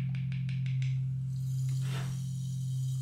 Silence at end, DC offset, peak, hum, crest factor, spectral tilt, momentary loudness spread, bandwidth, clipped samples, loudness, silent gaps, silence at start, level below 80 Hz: 0 s; under 0.1%; -26 dBFS; 50 Hz at -55 dBFS; 8 dB; -6.5 dB/octave; 4 LU; 13 kHz; under 0.1%; -34 LUFS; none; 0 s; -60 dBFS